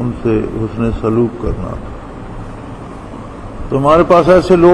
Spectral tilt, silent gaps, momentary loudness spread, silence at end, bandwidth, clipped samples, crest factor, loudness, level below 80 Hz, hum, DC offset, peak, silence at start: -8 dB/octave; none; 21 LU; 0 s; 11 kHz; under 0.1%; 14 dB; -13 LUFS; -28 dBFS; none; under 0.1%; 0 dBFS; 0 s